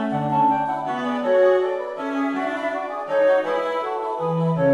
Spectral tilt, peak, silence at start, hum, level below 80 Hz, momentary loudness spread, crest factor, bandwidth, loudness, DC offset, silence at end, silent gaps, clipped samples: -7.5 dB/octave; -8 dBFS; 0 s; none; -64 dBFS; 8 LU; 14 dB; 9.8 kHz; -22 LUFS; under 0.1%; 0 s; none; under 0.1%